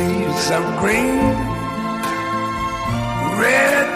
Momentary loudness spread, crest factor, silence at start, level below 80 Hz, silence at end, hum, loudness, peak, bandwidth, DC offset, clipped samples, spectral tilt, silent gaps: 8 LU; 14 dB; 0 s; -38 dBFS; 0 s; none; -18 LUFS; -4 dBFS; 16 kHz; under 0.1%; under 0.1%; -5 dB/octave; none